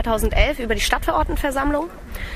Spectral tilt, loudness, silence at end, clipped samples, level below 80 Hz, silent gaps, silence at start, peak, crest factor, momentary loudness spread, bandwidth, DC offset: -4.5 dB/octave; -21 LUFS; 0 s; under 0.1%; -26 dBFS; none; 0 s; 0 dBFS; 20 dB; 7 LU; 15.5 kHz; under 0.1%